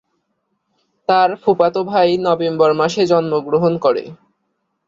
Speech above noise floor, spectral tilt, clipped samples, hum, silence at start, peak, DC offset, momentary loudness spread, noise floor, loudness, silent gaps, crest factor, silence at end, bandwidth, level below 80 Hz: 55 dB; -6 dB/octave; under 0.1%; none; 1.1 s; -2 dBFS; under 0.1%; 4 LU; -70 dBFS; -16 LUFS; none; 14 dB; 0.75 s; 7.6 kHz; -60 dBFS